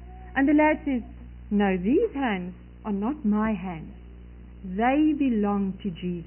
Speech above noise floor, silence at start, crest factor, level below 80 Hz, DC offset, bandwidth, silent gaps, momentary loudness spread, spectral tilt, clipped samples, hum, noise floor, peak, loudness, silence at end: 19 dB; 0 s; 14 dB; -44 dBFS; under 0.1%; 3.2 kHz; none; 17 LU; -11.5 dB/octave; under 0.1%; 60 Hz at -45 dBFS; -44 dBFS; -12 dBFS; -25 LUFS; 0 s